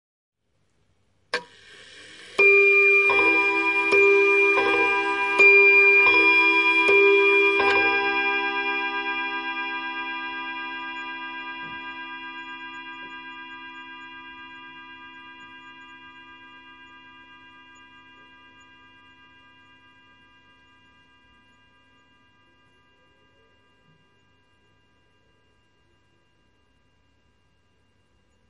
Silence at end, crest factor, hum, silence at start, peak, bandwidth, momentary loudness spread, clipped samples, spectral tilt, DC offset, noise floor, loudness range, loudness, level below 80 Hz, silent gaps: 12.4 s; 18 dB; none; 1.35 s; -6 dBFS; 10.5 kHz; 25 LU; under 0.1%; -3 dB/octave; under 0.1%; -70 dBFS; 23 LU; -18 LUFS; -68 dBFS; none